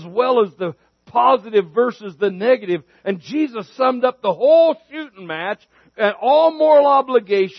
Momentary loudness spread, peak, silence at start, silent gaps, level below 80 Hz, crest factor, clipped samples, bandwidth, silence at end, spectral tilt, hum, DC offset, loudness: 14 LU; -2 dBFS; 0 s; none; -72 dBFS; 14 dB; under 0.1%; 6.2 kHz; 0.05 s; -7 dB/octave; none; under 0.1%; -17 LUFS